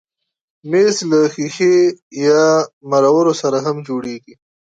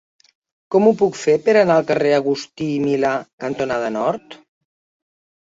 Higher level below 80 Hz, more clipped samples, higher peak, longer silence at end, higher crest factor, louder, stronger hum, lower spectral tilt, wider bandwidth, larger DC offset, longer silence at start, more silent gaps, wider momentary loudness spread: about the same, -66 dBFS vs -62 dBFS; neither; about the same, -2 dBFS vs -2 dBFS; second, 0.6 s vs 1.1 s; about the same, 14 dB vs 18 dB; first, -15 LUFS vs -18 LUFS; neither; about the same, -5 dB/octave vs -6 dB/octave; first, 9.2 kHz vs 7.8 kHz; neither; about the same, 0.65 s vs 0.7 s; first, 2.02-2.11 s, 2.73-2.81 s vs 3.33-3.38 s; about the same, 11 LU vs 10 LU